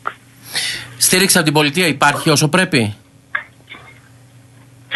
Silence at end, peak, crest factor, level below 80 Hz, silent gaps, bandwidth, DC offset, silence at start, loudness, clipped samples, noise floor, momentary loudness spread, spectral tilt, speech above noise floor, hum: 0 s; 0 dBFS; 18 dB; -56 dBFS; none; 12.5 kHz; under 0.1%; 0.05 s; -14 LUFS; under 0.1%; -44 dBFS; 14 LU; -3 dB/octave; 31 dB; none